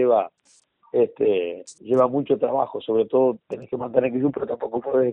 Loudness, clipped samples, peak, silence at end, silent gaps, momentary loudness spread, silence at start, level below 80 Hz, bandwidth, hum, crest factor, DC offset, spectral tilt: -23 LUFS; under 0.1%; -6 dBFS; 0 s; none; 11 LU; 0 s; -66 dBFS; 9.6 kHz; none; 16 dB; under 0.1%; -7.5 dB/octave